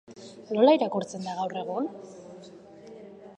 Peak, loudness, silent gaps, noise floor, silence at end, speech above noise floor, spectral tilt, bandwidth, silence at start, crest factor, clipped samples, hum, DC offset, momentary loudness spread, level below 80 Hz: -8 dBFS; -26 LUFS; none; -48 dBFS; 0.05 s; 22 dB; -5.5 dB/octave; 9.4 kHz; 0.1 s; 20 dB; under 0.1%; none; under 0.1%; 26 LU; -76 dBFS